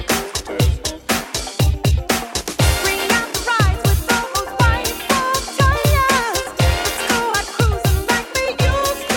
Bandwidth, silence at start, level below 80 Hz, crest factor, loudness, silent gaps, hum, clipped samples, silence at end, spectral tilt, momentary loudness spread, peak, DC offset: 17.5 kHz; 0 s; -24 dBFS; 16 dB; -18 LUFS; none; none; under 0.1%; 0 s; -4 dB/octave; 5 LU; -2 dBFS; under 0.1%